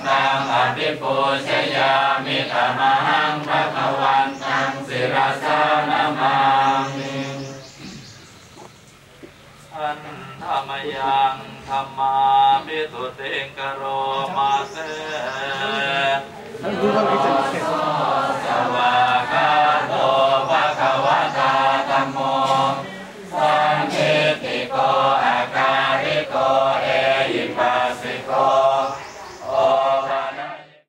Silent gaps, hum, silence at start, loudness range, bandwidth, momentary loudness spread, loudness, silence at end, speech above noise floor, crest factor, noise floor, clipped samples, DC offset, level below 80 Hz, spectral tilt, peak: none; none; 0 s; 6 LU; 13.5 kHz; 11 LU; -19 LUFS; 0.25 s; 26 dB; 16 dB; -46 dBFS; under 0.1%; under 0.1%; -62 dBFS; -4.5 dB/octave; -4 dBFS